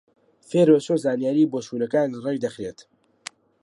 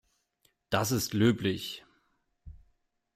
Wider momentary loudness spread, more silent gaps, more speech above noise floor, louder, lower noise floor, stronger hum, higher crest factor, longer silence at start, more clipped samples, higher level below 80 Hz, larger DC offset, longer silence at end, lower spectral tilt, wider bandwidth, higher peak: first, 23 LU vs 13 LU; neither; second, 22 dB vs 45 dB; first, -22 LUFS vs -29 LUFS; second, -44 dBFS vs -74 dBFS; neither; about the same, 18 dB vs 20 dB; second, 0.5 s vs 0.7 s; neither; second, -68 dBFS vs -60 dBFS; neither; first, 0.9 s vs 0.6 s; first, -6.5 dB/octave vs -5 dB/octave; second, 11.5 kHz vs 16 kHz; first, -4 dBFS vs -12 dBFS